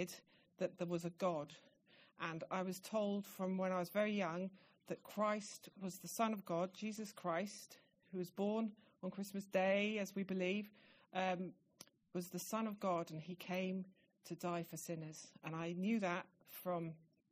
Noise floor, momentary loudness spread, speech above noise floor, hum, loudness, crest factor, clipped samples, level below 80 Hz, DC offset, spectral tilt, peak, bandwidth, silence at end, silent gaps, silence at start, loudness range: -66 dBFS; 13 LU; 23 dB; none; -43 LUFS; 20 dB; under 0.1%; -88 dBFS; under 0.1%; -5.5 dB/octave; -24 dBFS; 15.5 kHz; 0.35 s; none; 0 s; 3 LU